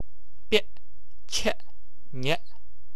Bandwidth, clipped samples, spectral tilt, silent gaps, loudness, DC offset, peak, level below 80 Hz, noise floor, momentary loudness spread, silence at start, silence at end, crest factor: 13.5 kHz; under 0.1%; -3 dB/octave; none; -29 LUFS; 7%; -8 dBFS; -52 dBFS; -55 dBFS; 16 LU; 0.5 s; 0.6 s; 26 dB